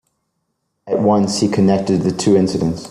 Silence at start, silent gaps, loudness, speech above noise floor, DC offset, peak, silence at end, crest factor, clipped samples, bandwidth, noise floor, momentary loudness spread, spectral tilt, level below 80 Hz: 0.85 s; none; -16 LUFS; 56 dB; under 0.1%; -2 dBFS; 0 s; 14 dB; under 0.1%; 11.5 kHz; -71 dBFS; 4 LU; -6 dB/octave; -50 dBFS